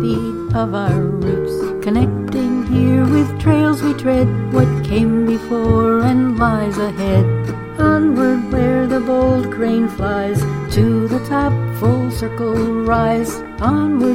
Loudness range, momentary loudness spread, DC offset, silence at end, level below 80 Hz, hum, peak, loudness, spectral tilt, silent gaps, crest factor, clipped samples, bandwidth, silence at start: 2 LU; 6 LU; under 0.1%; 0 s; -32 dBFS; none; 0 dBFS; -16 LUFS; -8 dB/octave; none; 14 dB; under 0.1%; 16 kHz; 0 s